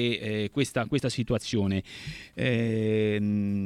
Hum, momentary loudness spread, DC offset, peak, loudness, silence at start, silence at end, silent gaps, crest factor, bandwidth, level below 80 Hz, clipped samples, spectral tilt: none; 6 LU; under 0.1%; -10 dBFS; -28 LUFS; 0 s; 0 s; none; 18 dB; 13.5 kHz; -54 dBFS; under 0.1%; -6 dB/octave